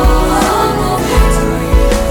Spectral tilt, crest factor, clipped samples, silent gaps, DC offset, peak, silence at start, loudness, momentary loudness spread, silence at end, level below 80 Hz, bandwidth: -5.5 dB/octave; 10 dB; under 0.1%; none; under 0.1%; 0 dBFS; 0 s; -12 LUFS; 2 LU; 0 s; -14 dBFS; 17.5 kHz